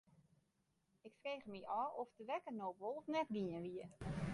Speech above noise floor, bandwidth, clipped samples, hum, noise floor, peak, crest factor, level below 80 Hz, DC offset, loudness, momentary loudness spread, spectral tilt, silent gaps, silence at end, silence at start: 38 dB; 11 kHz; under 0.1%; none; -83 dBFS; -30 dBFS; 18 dB; -68 dBFS; under 0.1%; -46 LUFS; 8 LU; -7 dB/octave; none; 0 s; 1.05 s